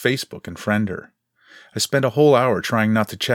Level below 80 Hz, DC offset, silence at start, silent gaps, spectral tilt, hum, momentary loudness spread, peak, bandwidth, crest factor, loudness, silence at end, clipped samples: -60 dBFS; under 0.1%; 0 s; none; -5 dB/octave; none; 15 LU; -2 dBFS; 17.5 kHz; 18 dB; -19 LUFS; 0 s; under 0.1%